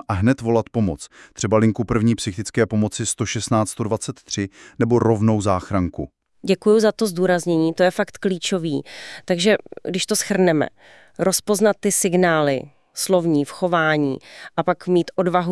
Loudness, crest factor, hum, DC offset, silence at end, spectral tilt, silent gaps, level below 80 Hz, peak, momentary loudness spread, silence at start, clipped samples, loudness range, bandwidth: -20 LUFS; 16 dB; none; under 0.1%; 0 s; -5 dB/octave; none; -50 dBFS; -4 dBFS; 10 LU; 0.1 s; under 0.1%; 2 LU; 12 kHz